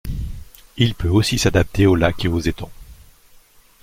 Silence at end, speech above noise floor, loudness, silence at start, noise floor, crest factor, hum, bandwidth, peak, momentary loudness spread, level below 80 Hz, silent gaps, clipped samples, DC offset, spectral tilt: 0.9 s; 32 dB; -18 LUFS; 0.05 s; -49 dBFS; 18 dB; none; 16.5 kHz; -2 dBFS; 19 LU; -34 dBFS; none; under 0.1%; under 0.1%; -5.5 dB/octave